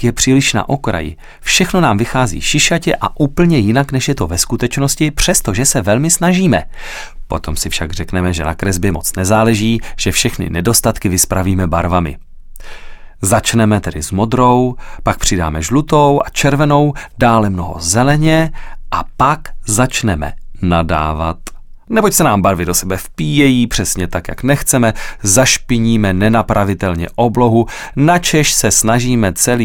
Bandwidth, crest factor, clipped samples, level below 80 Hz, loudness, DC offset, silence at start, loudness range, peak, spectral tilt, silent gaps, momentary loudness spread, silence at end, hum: 18 kHz; 14 dB; under 0.1%; -28 dBFS; -13 LUFS; under 0.1%; 0 s; 3 LU; 0 dBFS; -4.5 dB/octave; none; 9 LU; 0 s; none